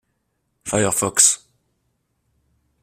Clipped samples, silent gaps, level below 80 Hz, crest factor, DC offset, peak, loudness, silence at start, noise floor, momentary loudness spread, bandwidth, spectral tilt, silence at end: under 0.1%; none; -56 dBFS; 24 dB; under 0.1%; 0 dBFS; -17 LUFS; 0.65 s; -72 dBFS; 13 LU; 16 kHz; -2 dB/octave; 1.45 s